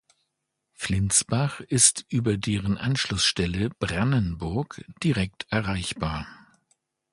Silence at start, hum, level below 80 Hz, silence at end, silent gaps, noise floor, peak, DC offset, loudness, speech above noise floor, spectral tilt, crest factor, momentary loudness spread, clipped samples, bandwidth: 0.8 s; none; -44 dBFS; 0.75 s; none; -80 dBFS; -2 dBFS; under 0.1%; -25 LUFS; 55 dB; -3.5 dB/octave; 26 dB; 12 LU; under 0.1%; 11.5 kHz